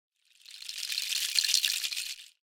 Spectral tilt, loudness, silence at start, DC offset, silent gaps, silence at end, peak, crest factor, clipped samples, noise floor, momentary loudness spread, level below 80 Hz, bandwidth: 6.5 dB/octave; -28 LUFS; 0.5 s; under 0.1%; none; 0.15 s; -8 dBFS; 26 dB; under 0.1%; -53 dBFS; 16 LU; -82 dBFS; 19 kHz